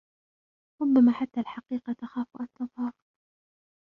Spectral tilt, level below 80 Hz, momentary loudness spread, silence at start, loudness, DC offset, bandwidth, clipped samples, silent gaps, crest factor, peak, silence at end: -8.5 dB/octave; -72 dBFS; 15 LU; 0.8 s; -28 LUFS; under 0.1%; 4.4 kHz; under 0.1%; none; 18 dB; -12 dBFS; 0.95 s